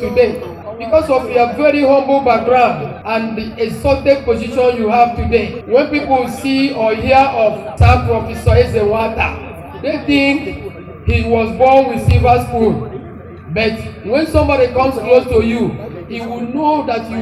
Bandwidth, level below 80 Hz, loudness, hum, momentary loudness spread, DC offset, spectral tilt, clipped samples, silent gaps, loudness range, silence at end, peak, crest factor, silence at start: 13.5 kHz; -28 dBFS; -14 LUFS; none; 13 LU; under 0.1%; -7 dB/octave; under 0.1%; none; 2 LU; 0 s; 0 dBFS; 14 dB; 0 s